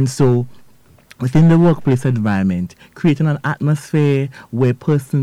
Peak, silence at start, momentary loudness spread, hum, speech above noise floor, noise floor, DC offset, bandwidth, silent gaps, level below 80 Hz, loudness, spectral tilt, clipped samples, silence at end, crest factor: -6 dBFS; 0 s; 10 LU; none; 33 dB; -48 dBFS; under 0.1%; 12.5 kHz; none; -46 dBFS; -16 LUFS; -8 dB/octave; under 0.1%; 0 s; 10 dB